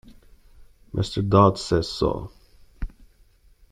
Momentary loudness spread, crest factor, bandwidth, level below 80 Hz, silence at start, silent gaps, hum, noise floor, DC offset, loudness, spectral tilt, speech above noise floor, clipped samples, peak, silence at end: 22 LU; 22 dB; 11 kHz; -42 dBFS; 0.1 s; none; none; -56 dBFS; under 0.1%; -22 LUFS; -7 dB/octave; 35 dB; under 0.1%; -4 dBFS; 0.85 s